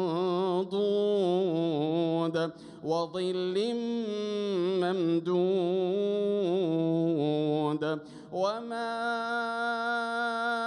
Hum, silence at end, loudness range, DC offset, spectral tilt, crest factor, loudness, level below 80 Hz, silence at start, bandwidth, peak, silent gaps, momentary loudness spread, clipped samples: none; 0 s; 2 LU; under 0.1%; -7 dB/octave; 12 dB; -29 LUFS; -78 dBFS; 0 s; 10.5 kHz; -16 dBFS; none; 5 LU; under 0.1%